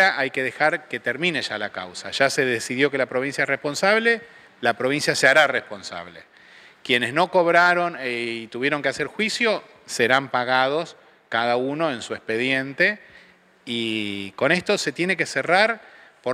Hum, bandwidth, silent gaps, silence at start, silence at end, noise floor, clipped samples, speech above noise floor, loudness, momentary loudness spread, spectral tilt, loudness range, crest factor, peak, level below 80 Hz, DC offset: none; 15.5 kHz; none; 0 s; 0 s; -53 dBFS; under 0.1%; 30 dB; -21 LUFS; 12 LU; -3.5 dB/octave; 3 LU; 20 dB; -2 dBFS; -70 dBFS; under 0.1%